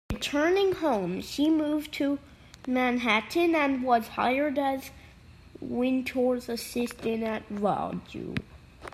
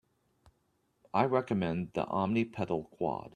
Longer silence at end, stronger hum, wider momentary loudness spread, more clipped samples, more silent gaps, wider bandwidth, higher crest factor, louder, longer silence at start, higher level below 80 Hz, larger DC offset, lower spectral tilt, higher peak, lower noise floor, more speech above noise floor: about the same, 0 s vs 0.05 s; neither; first, 11 LU vs 6 LU; neither; neither; first, 15.5 kHz vs 9.8 kHz; about the same, 18 dB vs 22 dB; first, -28 LUFS vs -33 LUFS; second, 0.1 s vs 1.15 s; first, -54 dBFS vs -66 dBFS; neither; second, -5 dB/octave vs -8 dB/octave; about the same, -10 dBFS vs -12 dBFS; second, -51 dBFS vs -75 dBFS; second, 24 dB vs 43 dB